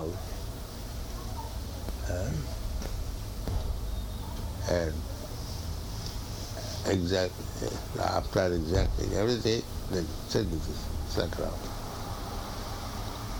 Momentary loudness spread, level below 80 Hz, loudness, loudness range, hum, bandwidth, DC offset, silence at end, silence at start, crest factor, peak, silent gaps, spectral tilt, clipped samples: 10 LU; -38 dBFS; -33 LUFS; 6 LU; none; 19.5 kHz; under 0.1%; 0 s; 0 s; 20 dB; -12 dBFS; none; -5.5 dB/octave; under 0.1%